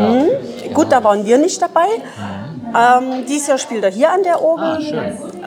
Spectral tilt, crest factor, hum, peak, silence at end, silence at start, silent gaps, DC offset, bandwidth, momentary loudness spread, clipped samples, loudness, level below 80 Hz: -4.5 dB/octave; 14 dB; none; 0 dBFS; 0 s; 0 s; none; under 0.1%; 19 kHz; 10 LU; under 0.1%; -15 LUFS; -60 dBFS